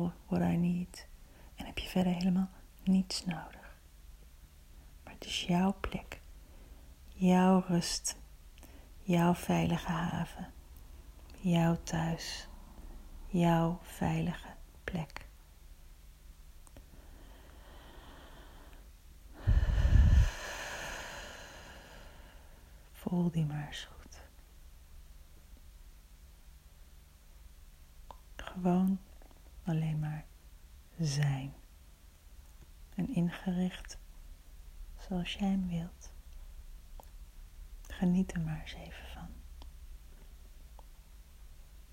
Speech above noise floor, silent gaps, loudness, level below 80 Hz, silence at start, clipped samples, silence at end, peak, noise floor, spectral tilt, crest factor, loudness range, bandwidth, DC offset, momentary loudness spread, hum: 25 dB; none; -33 LUFS; -42 dBFS; 0 s; under 0.1%; 0.1 s; -14 dBFS; -57 dBFS; -6 dB/octave; 22 dB; 12 LU; 16 kHz; under 0.1%; 26 LU; none